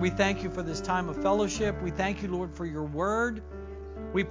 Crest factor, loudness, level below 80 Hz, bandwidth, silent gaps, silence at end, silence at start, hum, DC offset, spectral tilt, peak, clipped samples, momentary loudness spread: 20 dB; -30 LUFS; -44 dBFS; 7.6 kHz; none; 0 s; 0 s; none; under 0.1%; -5.5 dB/octave; -10 dBFS; under 0.1%; 13 LU